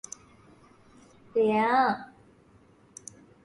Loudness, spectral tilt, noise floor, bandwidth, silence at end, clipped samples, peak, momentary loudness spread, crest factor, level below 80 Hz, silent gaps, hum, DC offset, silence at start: -26 LUFS; -4.5 dB/octave; -59 dBFS; 11.5 kHz; 1.4 s; under 0.1%; -12 dBFS; 25 LU; 18 dB; -68 dBFS; none; none; under 0.1%; 1.35 s